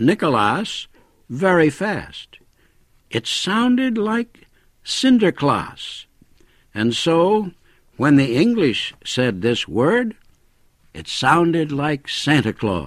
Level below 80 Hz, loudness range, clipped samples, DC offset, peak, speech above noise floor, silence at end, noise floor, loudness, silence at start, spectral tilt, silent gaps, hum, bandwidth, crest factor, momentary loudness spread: -52 dBFS; 3 LU; under 0.1%; under 0.1%; -2 dBFS; 38 dB; 0 s; -57 dBFS; -19 LUFS; 0 s; -5.5 dB/octave; none; none; 13.5 kHz; 18 dB; 16 LU